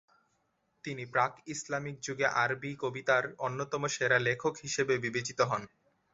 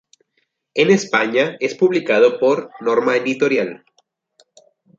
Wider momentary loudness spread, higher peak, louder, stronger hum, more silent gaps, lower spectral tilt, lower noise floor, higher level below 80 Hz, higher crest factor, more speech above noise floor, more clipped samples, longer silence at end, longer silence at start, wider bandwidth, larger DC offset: about the same, 9 LU vs 7 LU; second, -12 dBFS vs -2 dBFS; second, -32 LUFS vs -17 LUFS; neither; neither; second, -3 dB/octave vs -5 dB/octave; first, -76 dBFS vs -69 dBFS; about the same, -70 dBFS vs -68 dBFS; about the same, 20 dB vs 16 dB; second, 44 dB vs 52 dB; neither; second, 0.45 s vs 1.25 s; about the same, 0.85 s vs 0.75 s; about the same, 8 kHz vs 7.8 kHz; neither